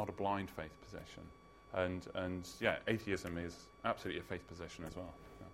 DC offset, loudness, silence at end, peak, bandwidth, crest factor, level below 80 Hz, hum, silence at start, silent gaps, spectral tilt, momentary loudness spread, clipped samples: under 0.1%; -42 LUFS; 0 s; -18 dBFS; 16 kHz; 24 dB; -64 dBFS; none; 0 s; none; -5.5 dB/octave; 15 LU; under 0.1%